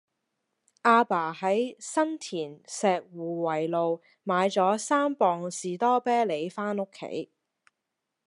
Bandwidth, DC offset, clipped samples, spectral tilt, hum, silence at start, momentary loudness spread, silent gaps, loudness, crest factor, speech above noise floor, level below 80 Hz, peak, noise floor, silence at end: 11.5 kHz; under 0.1%; under 0.1%; -4.5 dB/octave; none; 0.85 s; 12 LU; none; -27 LUFS; 22 dB; 57 dB; -86 dBFS; -6 dBFS; -84 dBFS; 1 s